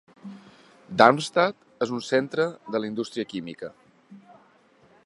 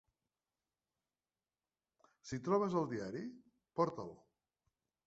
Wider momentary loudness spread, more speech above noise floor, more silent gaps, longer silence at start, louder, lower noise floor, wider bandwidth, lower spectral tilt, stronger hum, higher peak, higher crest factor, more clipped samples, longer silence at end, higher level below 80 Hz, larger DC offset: first, 22 LU vs 16 LU; second, 35 dB vs over 52 dB; neither; second, 0.25 s vs 2.25 s; first, -24 LUFS vs -39 LUFS; second, -59 dBFS vs under -90 dBFS; first, 11.5 kHz vs 8 kHz; second, -5 dB/octave vs -7 dB/octave; neither; first, 0 dBFS vs -20 dBFS; about the same, 26 dB vs 22 dB; neither; about the same, 0.9 s vs 0.9 s; first, -70 dBFS vs -78 dBFS; neither